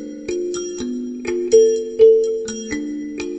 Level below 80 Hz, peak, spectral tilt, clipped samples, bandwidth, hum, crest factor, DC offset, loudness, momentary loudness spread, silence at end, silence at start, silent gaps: -52 dBFS; -2 dBFS; -4 dB/octave; under 0.1%; 8.4 kHz; none; 16 dB; under 0.1%; -18 LUFS; 13 LU; 0 s; 0 s; none